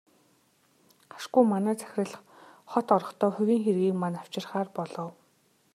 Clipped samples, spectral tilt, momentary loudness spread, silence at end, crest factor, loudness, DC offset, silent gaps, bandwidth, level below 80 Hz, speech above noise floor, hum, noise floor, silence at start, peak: under 0.1%; -7 dB/octave; 13 LU; 0.65 s; 22 dB; -28 LUFS; under 0.1%; none; 14.5 kHz; -80 dBFS; 40 dB; none; -67 dBFS; 1.15 s; -8 dBFS